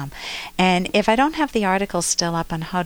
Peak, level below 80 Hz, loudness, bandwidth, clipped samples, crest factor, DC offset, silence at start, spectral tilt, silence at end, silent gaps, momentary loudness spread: -4 dBFS; -44 dBFS; -20 LUFS; over 20 kHz; under 0.1%; 16 dB; under 0.1%; 0 s; -4 dB/octave; 0 s; none; 9 LU